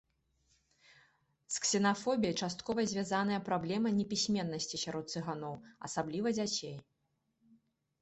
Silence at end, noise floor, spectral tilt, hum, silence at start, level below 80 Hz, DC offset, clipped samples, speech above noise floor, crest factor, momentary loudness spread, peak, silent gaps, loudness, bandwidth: 1.2 s; -81 dBFS; -4 dB/octave; none; 1.5 s; -70 dBFS; under 0.1%; under 0.1%; 46 dB; 18 dB; 9 LU; -18 dBFS; none; -35 LUFS; 8.2 kHz